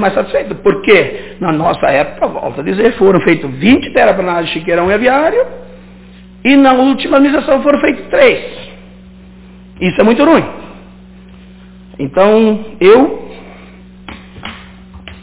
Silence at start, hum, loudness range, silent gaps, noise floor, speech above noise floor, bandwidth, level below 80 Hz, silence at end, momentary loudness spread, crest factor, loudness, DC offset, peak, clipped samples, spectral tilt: 0 s; 60 Hz at -40 dBFS; 3 LU; none; -36 dBFS; 26 dB; 4 kHz; -40 dBFS; 0.1 s; 19 LU; 12 dB; -11 LUFS; under 0.1%; 0 dBFS; 0.4%; -10 dB/octave